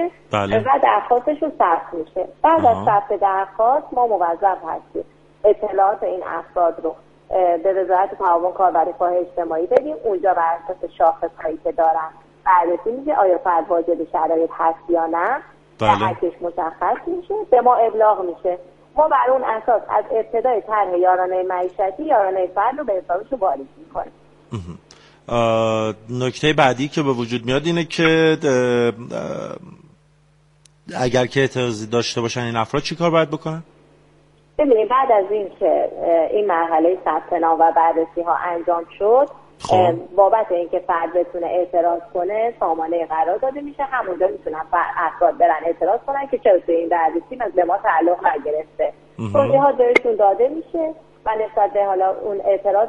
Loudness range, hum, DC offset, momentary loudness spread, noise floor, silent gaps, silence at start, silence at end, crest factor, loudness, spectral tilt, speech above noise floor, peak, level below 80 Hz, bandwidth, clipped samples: 4 LU; none; under 0.1%; 10 LU; -55 dBFS; none; 0 s; 0 s; 18 dB; -19 LUFS; -6 dB/octave; 37 dB; 0 dBFS; -54 dBFS; 10.5 kHz; under 0.1%